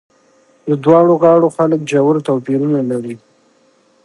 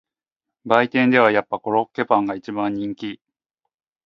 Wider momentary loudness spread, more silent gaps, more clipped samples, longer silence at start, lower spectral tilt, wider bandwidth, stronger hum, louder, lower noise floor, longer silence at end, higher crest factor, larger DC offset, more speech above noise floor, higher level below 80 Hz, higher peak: about the same, 14 LU vs 12 LU; neither; neither; about the same, 0.65 s vs 0.65 s; about the same, -8 dB/octave vs -7 dB/octave; first, 11.5 kHz vs 7.2 kHz; neither; first, -13 LUFS vs -20 LUFS; second, -54 dBFS vs -86 dBFS; about the same, 0.9 s vs 0.9 s; second, 14 dB vs 22 dB; neither; second, 41 dB vs 67 dB; about the same, -62 dBFS vs -66 dBFS; about the same, 0 dBFS vs 0 dBFS